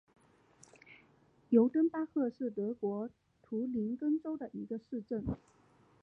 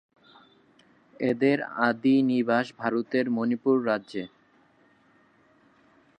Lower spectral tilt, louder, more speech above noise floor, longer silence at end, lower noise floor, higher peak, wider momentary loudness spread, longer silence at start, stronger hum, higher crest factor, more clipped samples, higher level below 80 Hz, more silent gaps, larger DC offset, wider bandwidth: first, -9.5 dB/octave vs -7.5 dB/octave; second, -35 LUFS vs -26 LUFS; second, 33 dB vs 37 dB; second, 0.65 s vs 1.9 s; first, -67 dBFS vs -62 dBFS; second, -14 dBFS vs -8 dBFS; first, 13 LU vs 8 LU; second, 0.9 s vs 1.2 s; neither; about the same, 22 dB vs 18 dB; neither; first, -62 dBFS vs -76 dBFS; neither; neither; about the same, 8 kHz vs 8.8 kHz